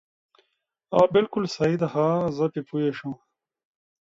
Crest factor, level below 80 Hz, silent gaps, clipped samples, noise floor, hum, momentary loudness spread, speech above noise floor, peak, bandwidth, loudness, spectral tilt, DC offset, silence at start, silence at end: 20 dB; -62 dBFS; none; under 0.1%; -76 dBFS; none; 12 LU; 53 dB; -4 dBFS; 7.8 kHz; -24 LUFS; -7 dB/octave; under 0.1%; 0.9 s; 1 s